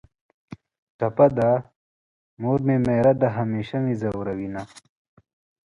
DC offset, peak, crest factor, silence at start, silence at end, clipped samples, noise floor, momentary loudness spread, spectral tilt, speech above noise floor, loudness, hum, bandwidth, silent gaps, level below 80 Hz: under 0.1%; -4 dBFS; 20 dB; 0.5 s; 0.9 s; under 0.1%; under -90 dBFS; 12 LU; -9 dB/octave; over 69 dB; -22 LUFS; none; 11 kHz; 0.78-0.99 s, 1.76-2.37 s; -54 dBFS